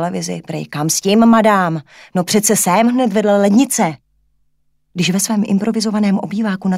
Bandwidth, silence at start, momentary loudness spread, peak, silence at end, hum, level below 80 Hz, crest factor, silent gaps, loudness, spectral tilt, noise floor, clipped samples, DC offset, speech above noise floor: 16 kHz; 0 s; 12 LU; 0 dBFS; 0 s; none; -58 dBFS; 14 dB; none; -15 LUFS; -4.5 dB/octave; -60 dBFS; under 0.1%; under 0.1%; 46 dB